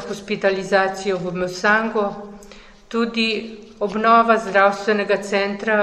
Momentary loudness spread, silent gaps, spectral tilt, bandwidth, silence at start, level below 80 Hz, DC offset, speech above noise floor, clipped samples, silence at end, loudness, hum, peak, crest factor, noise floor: 12 LU; none; -4.5 dB/octave; 13 kHz; 0 s; -52 dBFS; under 0.1%; 24 dB; under 0.1%; 0 s; -19 LUFS; none; -2 dBFS; 18 dB; -43 dBFS